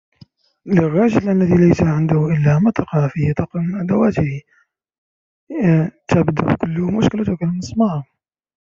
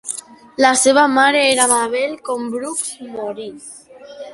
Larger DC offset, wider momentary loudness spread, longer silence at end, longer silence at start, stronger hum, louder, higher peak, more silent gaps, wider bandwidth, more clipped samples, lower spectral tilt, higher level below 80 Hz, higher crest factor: neither; second, 8 LU vs 20 LU; first, 0.65 s vs 0 s; first, 0.65 s vs 0.05 s; neither; about the same, -17 LUFS vs -15 LUFS; about the same, -2 dBFS vs 0 dBFS; first, 4.98-5.47 s vs none; second, 7.4 kHz vs 12 kHz; neither; first, -8.5 dB/octave vs -1 dB/octave; first, -46 dBFS vs -64 dBFS; about the same, 16 dB vs 18 dB